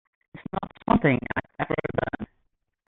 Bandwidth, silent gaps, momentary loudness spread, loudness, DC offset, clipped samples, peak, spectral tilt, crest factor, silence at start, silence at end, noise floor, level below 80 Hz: 4.1 kHz; none; 16 LU; -27 LUFS; under 0.1%; under 0.1%; -8 dBFS; -10.5 dB/octave; 20 dB; 0.35 s; 0.65 s; -73 dBFS; -48 dBFS